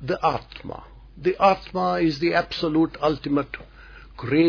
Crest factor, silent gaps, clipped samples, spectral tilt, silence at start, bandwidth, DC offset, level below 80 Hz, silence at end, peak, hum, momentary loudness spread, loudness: 18 dB; none; under 0.1%; -7 dB/octave; 0 s; 5.4 kHz; under 0.1%; -46 dBFS; 0 s; -6 dBFS; none; 17 LU; -23 LUFS